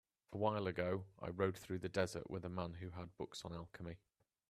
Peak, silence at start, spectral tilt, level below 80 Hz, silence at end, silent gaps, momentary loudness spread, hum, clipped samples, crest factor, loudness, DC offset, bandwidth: -22 dBFS; 0.3 s; -6 dB/octave; -70 dBFS; 0.55 s; none; 12 LU; none; under 0.1%; 22 dB; -44 LUFS; under 0.1%; 14 kHz